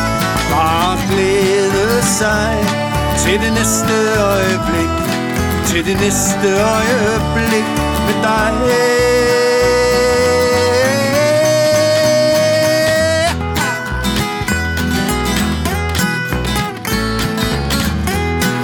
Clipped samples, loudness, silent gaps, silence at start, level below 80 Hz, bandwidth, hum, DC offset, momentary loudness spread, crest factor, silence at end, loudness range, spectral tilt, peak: under 0.1%; -14 LUFS; none; 0 s; -28 dBFS; over 20 kHz; none; under 0.1%; 5 LU; 14 dB; 0 s; 4 LU; -4 dB/octave; 0 dBFS